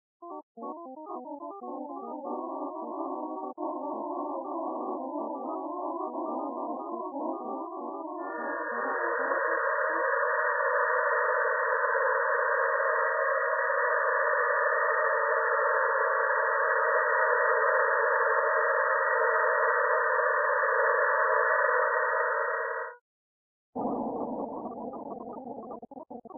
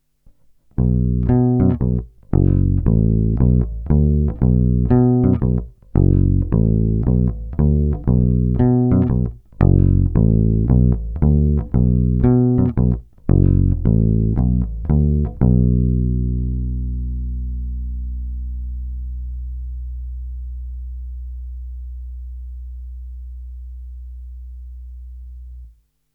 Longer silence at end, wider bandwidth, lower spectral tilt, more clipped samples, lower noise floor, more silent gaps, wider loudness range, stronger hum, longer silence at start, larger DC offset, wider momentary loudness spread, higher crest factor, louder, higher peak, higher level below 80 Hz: second, 0 s vs 0.45 s; second, 2.1 kHz vs 2.5 kHz; second, 5 dB/octave vs -14 dB/octave; neither; first, under -90 dBFS vs -51 dBFS; first, 0.43-0.55 s, 23.01-23.73 s vs none; second, 11 LU vs 17 LU; neither; second, 0.2 s vs 0.8 s; neither; second, 15 LU vs 20 LU; about the same, 16 dB vs 16 dB; second, -28 LUFS vs -18 LUFS; second, -12 dBFS vs 0 dBFS; second, -80 dBFS vs -22 dBFS